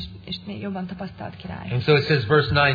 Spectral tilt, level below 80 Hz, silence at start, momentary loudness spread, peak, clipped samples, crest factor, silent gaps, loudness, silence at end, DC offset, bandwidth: -8 dB/octave; -46 dBFS; 0 s; 16 LU; -4 dBFS; under 0.1%; 18 dB; none; -22 LUFS; 0 s; under 0.1%; 5 kHz